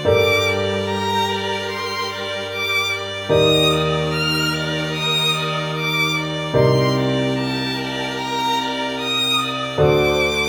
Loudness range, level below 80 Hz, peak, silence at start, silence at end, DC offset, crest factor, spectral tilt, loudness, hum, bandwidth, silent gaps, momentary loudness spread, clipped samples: 2 LU; -44 dBFS; -4 dBFS; 0 s; 0 s; under 0.1%; 16 dB; -4.5 dB/octave; -19 LUFS; none; over 20 kHz; none; 8 LU; under 0.1%